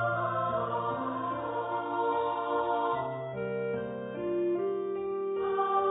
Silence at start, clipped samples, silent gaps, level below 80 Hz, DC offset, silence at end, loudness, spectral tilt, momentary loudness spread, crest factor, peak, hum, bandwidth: 0 s; under 0.1%; none; -66 dBFS; under 0.1%; 0 s; -32 LUFS; -3 dB/octave; 5 LU; 14 dB; -18 dBFS; none; 3.9 kHz